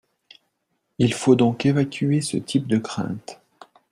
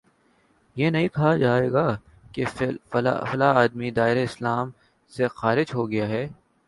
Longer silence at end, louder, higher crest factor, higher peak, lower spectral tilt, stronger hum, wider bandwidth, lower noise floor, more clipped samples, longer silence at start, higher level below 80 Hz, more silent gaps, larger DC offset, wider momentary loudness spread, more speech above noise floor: first, 0.6 s vs 0.35 s; about the same, -21 LUFS vs -23 LUFS; about the same, 20 dB vs 20 dB; about the same, -4 dBFS vs -4 dBFS; second, -6 dB/octave vs -7.5 dB/octave; neither; about the same, 12.5 kHz vs 11.5 kHz; first, -74 dBFS vs -63 dBFS; neither; first, 1 s vs 0.75 s; about the same, -58 dBFS vs -56 dBFS; neither; neither; about the same, 12 LU vs 11 LU; first, 53 dB vs 40 dB